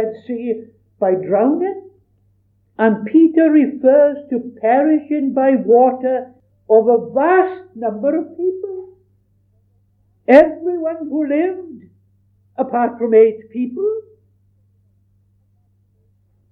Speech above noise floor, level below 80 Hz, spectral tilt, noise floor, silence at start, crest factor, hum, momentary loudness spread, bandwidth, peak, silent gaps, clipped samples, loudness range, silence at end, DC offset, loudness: 44 dB; -62 dBFS; -9 dB/octave; -59 dBFS; 0 s; 16 dB; none; 13 LU; 4.8 kHz; 0 dBFS; none; under 0.1%; 5 LU; 2.5 s; under 0.1%; -16 LUFS